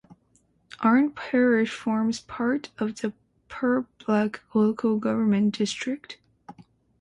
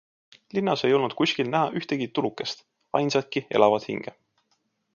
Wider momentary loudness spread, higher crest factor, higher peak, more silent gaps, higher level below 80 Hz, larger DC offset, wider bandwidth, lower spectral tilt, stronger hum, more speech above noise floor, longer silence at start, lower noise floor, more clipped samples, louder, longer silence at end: about the same, 11 LU vs 12 LU; second, 16 dB vs 22 dB; second, -10 dBFS vs -4 dBFS; neither; first, -64 dBFS vs -70 dBFS; neither; first, 10.5 kHz vs 7.2 kHz; about the same, -6 dB/octave vs -5.5 dB/octave; neither; second, 41 dB vs 48 dB; first, 0.8 s vs 0.55 s; second, -65 dBFS vs -72 dBFS; neither; about the same, -25 LUFS vs -25 LUFS; second, 0.5 s vs 0.85 s